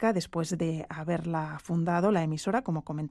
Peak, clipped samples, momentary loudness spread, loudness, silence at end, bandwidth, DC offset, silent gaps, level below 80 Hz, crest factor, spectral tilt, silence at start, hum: -14 dBFS; under 0.1%; 7 LU; -30 LUFS; 0 s; 12.5 kHz; under 0.1%; none; -60 dBFS; 16 dB; -6.5 dB/octave; 0 s; none